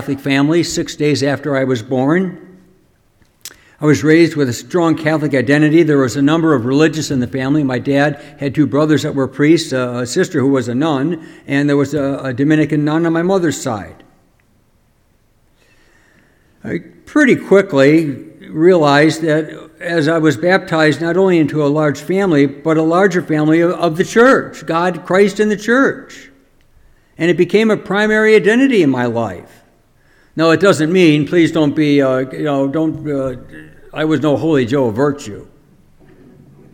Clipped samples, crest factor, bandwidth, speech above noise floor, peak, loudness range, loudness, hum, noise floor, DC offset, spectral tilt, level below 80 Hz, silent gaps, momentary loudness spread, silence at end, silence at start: under 0.1%; 14 dB; 15.5 kHz; 42 dB; 0 dBFS; 5 LU; -14 LUFS; none; -55 dBFS; under 0.1%; -6 dB/octave; -52 dBFS; none; 10 LU; 1.3 s; 0 s